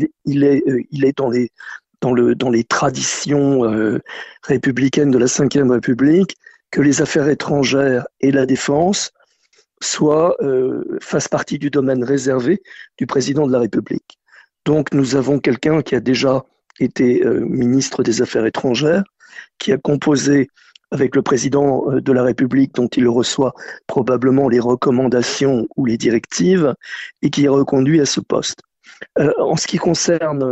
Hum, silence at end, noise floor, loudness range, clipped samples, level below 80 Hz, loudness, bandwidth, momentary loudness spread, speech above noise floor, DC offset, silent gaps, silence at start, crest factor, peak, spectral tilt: none; 0 s; -58 dBFS; 3 LU; under 0.1%; -52 dBFS; -16 LUFS; 8.4 kHz; 8 LU; 42 dB; under 0.1%; none; 0 s; 14 dB; -2 dBFS; -5 dB/octave